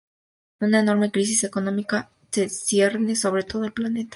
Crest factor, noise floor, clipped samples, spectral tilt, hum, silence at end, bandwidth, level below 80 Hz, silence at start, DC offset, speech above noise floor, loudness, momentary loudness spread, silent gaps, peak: 18 dB; under -90 dBFS; under 0.1%; -4 dB/octave; none; 0 s; 11.5 kHz; -62 dBFS; 0.6 s; under 0.1%; over 68 dB; -23 LUFS; 7 LU; none; -6 dBFS